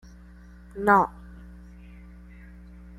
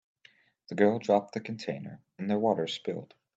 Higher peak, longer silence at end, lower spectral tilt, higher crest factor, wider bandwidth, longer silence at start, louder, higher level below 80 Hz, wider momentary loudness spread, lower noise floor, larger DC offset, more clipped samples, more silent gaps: first, -6 dBFS vs -10 dBFS; first, 1.65 s vs 0.3 s; about the same, -7.5 dB/octave vs -6.5 dB/octave; about the same, 24 dB vs 20 dB; first, 16 kHz vs 8 kHz; about the same, 0.75 s vs 0.7 s; first, -23 LUFS vs -30 LUFS; first, -48 dBFS vs -78 dBFS; first, 28 LU vs 14 LU; second, -48 dBFS vs -63 dBFS; neither; neither; neither